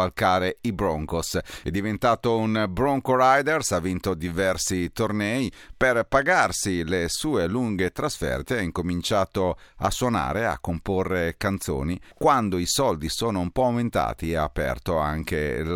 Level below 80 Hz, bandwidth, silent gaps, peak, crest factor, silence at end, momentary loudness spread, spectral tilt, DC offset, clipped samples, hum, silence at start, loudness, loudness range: -42 dBFS; 18 kHz; none; -6 dBFS; 18 dB; 0 s; 7 LU; -4.5 dB/octave; under 0.1%; under 0.1%; none; 0 s; -24 LUFS; 3 LU